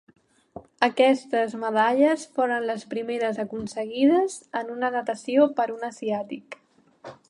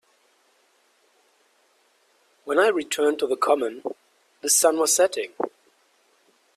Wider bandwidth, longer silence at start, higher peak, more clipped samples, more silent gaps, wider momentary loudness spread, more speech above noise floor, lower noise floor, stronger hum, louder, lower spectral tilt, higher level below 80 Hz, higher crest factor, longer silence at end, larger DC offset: second, 11 kHz vs 15.5 kHz; second, 0.55 s vs 2.45 s; about the same, -4 dBFS vs -6 dBFS; neither; neither; second, 11 LU vs 16 LU; second, 23 dB vs 42 dB; second, -47 dBFS vs -64 dBFS; neither; about the same, -24 LUFS vs -22 LUFS; first, -4.5 dB/octave vs -0.5 dB/octave; first, -68 dBFS vs -74 dBFS; about the same, 20 dB vs 20 dB; second, 0.15 s vs 1.1 s; neither